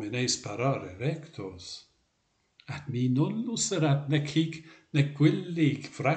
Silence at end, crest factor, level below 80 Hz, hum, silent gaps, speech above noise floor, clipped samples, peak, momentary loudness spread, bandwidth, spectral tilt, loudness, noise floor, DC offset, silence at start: 0 s; 20 dB; -68 dBFS; none; none; 45 dB; under 0.1%; -10 dBFS; 16 LU; 9.2 kHz; -5.5 dB/octave; -29 LUFS; -74 dBFS; under 0.1%; 0 s